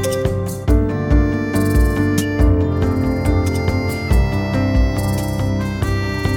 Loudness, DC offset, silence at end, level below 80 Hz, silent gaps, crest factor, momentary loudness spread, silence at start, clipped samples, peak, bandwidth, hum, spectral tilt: -18 LUFS; under 0.1%; 0 s; -22 dBFS; none; 14 dB; 4 LU; 0 s; under 0.1%; -2 dBFS; 17.5 kHz; none; -7 dB/octave